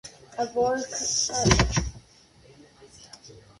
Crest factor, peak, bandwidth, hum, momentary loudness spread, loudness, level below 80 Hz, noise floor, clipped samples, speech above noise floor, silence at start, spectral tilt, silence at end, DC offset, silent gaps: 24 dB; -4 dBFS; 11.5 kHz; none; 25 LU; -24 LUFS; -38 dBFS; -55 dBFS; under 0.1%; 31 dB; 0.05 s; -3.5 dB/octave; 0.2 s; under 0.1%; none